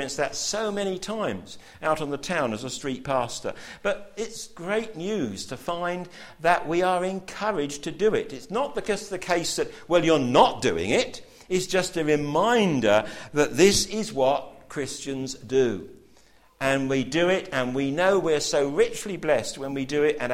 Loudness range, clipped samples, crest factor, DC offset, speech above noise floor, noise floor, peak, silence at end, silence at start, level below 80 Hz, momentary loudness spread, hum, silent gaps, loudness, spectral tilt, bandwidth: 7 LU; under 0.1%; 22 dB; under 0.1%; 31 dB; -56 dBFS; -4 dBFS; 0 s; 0 s; -52 dBFS; 11 LU; none; none; -25 LUFS; -4 dB/octave; 16 kHz